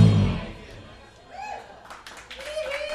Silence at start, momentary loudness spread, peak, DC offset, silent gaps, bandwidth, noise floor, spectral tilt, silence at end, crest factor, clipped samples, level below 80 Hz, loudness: 0 s; 20 LU; -4 dBFS; under 0.1%; none; 11.5 kHz; -47 dBFS; -7 dB/octave; 0 s; 22 dB; under 0.1%; -42 dBFS; -28 LUFS